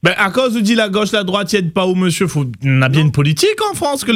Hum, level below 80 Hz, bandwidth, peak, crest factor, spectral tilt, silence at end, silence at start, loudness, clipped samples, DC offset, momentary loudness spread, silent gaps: none; -50 dBFS; 16 kHz; 0 dBFS; 14 dB; -5 dB/octave; 0 s; 0.05 s; -14 LUFS; under 0.1%; under 0.1%; 4 LU; none